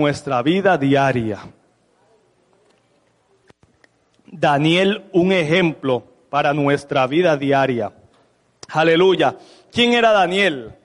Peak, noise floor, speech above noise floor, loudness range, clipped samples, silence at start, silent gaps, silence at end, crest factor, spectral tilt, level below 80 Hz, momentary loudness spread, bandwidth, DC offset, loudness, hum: -4 dBFS; -61 dBFS; 44 dB; 7 LU; under 0.1%; 0 s; none; 0.15 s; 16 dB; -6 dB/octave; -58 dBFS; 10 LU; 11 kHz; under 0.1%; -17 LUFS; none